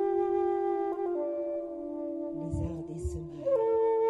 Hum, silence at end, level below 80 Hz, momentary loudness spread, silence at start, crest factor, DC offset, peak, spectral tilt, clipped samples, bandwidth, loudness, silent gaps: none; 0 s; -48 dBFS; 10 LU; 0 s; 12 dB; under 0.1%; -18 dBFS; -9 dB/octave; under 0.1%; 11 kHz; -32 LUFS; none